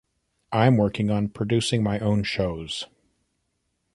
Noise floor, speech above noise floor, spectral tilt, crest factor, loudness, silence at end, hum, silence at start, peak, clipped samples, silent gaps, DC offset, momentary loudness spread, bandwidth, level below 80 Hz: -75 dBFS; 52 dB; -6 dB/octave; 20 dB; -24 LUFS; 1.1 s; none; 0.5 s; -6 dBFS; under 0.1%; none; under 0.1%; 12 LU; 11.5 kHz; -48 dBFS